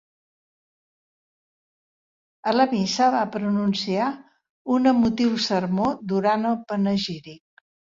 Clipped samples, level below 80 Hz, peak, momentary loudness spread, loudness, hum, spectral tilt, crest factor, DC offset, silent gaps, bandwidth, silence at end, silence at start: under 0.1%; -60 dBFS; -6 dBFS; 8 LU; -23 LUFS; none; -5.5 dB/octave; 18 dB; under 0.1%; 4.50-4.65 s; 7.6 kHz; 0.55 s; 2.45 s